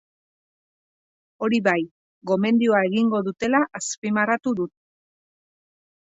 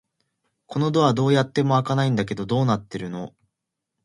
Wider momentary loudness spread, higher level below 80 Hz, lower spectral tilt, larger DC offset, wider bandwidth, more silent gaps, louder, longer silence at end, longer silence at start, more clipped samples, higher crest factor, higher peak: second, 9 LU vs 13 LU; second, -68 dBFS vs -58 dBFS; second, -5 dB/octave vs -7 dB/octave; neither; second, 8 kHz vs 11 kHz; first, 1.91-2.21 s, 3.98-4.02 s vs none; about the same, -22 LUFS vs -22 LUFS; first, 1.4 s vs 0.75 s; first, 1.4 s vs 0.7 s; neither; about the same, 18 dB vs 18 dB; about the same, -6 dBFS vs -6 dBFS